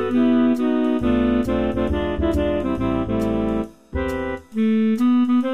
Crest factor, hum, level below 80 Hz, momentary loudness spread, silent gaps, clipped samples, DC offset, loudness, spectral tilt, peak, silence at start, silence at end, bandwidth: 12 dB; none; -34 dBFS; 8 LU; none; under 0.1%; 0.8%; -21 LUFS; -8 dB/octave; -8 dBFS; 0 s; 0 s; 9 kHz